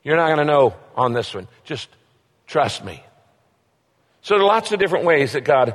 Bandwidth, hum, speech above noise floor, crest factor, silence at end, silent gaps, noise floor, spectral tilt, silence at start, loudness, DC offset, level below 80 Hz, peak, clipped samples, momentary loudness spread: 12.5 kHz; none; 46 dB; 16 dB; 0 s; none; -64 dBFS; -5 dB/octave; 0.05 s; -18 LUFS; under 0.1%; -60 dBFS; -4 dBFS; under 0.1%; 16 LU